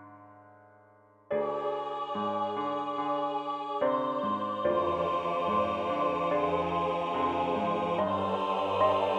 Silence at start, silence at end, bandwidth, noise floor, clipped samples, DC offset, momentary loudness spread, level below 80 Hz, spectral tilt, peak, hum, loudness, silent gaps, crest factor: 0 s; 0 s; 9.6 kHz; -60 dBFS; under 0.1%; under 0.1%; 5 LU; -68 dBFS; -7 dB/octave; -14 dBFS; none; -30 LUFS; none; 16 dB